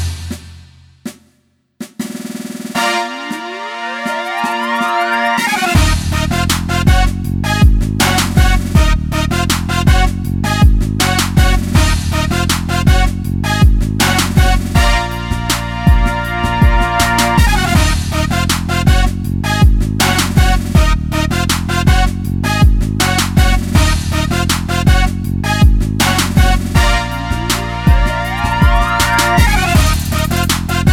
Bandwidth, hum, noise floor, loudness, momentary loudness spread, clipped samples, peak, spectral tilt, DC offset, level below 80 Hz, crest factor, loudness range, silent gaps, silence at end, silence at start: 17.5 kHz; none; -58 dBFS; -13 LUFS; 7 LU; under 0.1%; 0 dBFS; -4.5 dB/octave; under 0.1%; -16 dBFS; 12 dB; 3 LU; none; 0 s; 0 s